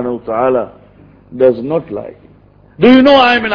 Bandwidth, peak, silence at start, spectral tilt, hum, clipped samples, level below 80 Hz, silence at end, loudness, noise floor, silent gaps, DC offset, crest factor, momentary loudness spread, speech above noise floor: 5.4 kHz; 0 dBFS; 0 s; -7 dB/octave; none; 0.7%; -46 dBFS; 0 s; -11 LUFS; -44 dBFS; none; under 0.1%; 12 dB; 20 LU; 33 dB